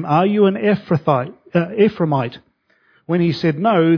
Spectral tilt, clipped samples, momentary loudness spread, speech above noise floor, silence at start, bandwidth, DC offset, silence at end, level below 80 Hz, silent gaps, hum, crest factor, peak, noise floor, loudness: -9 dB/octave; under 0.1%; 6 LU; 43 dB; 0 s; 5.4 kHz; under 0.1%; 0 s; -60 dBFS; none; none; 16 dB; -2 dBFS; -59 dBFS; -18 LUFS